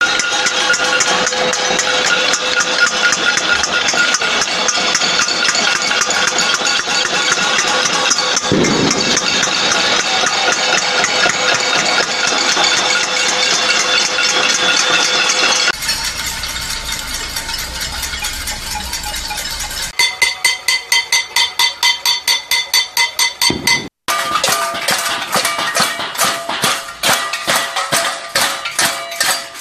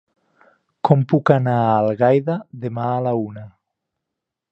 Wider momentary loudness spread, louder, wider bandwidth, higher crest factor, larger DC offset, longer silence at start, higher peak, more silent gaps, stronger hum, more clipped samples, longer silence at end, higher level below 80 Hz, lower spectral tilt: second, 8 LU vs 11 LU; first, -13 LUFS vs -19 LUFS; first, 14.5 kHz vs 6 kHz; about the same, 16 dB vs 20 dB; neither; second, 0 s vs 0.85 s; about the same, 0 dBFS vs 0 dBFS; neither; neither; neither; second, 0 s vs 1.05 s; first, -40 dBFS vs -60 dBFS; second, -0.5 dB/octave vs -10 dB/octave